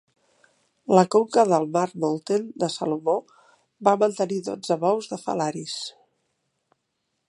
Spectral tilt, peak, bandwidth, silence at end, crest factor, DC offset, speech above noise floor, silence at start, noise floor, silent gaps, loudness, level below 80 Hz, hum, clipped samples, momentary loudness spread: -5.5 dB/octave; -2 dBFS; 11.5 kHz; 1.4 s; 22 dB; under 0.1%; 54 dB; 0.9 s; -77 dBFS; none; -23 LUFS; -74 dBFS; none; under 0.1%; 10 LU